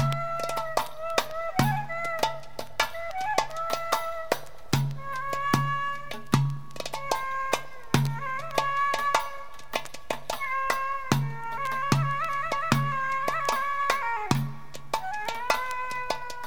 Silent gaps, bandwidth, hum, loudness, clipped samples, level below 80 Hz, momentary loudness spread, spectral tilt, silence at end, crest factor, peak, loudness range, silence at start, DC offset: none; over 20 kHz; none; -29 LUFS; under 0.1%; -54 dBFS; 8 LU; -4.5 dB/octave; 0 s; 24 dB; -6 dBFS; 2 LU; 0 s; 1%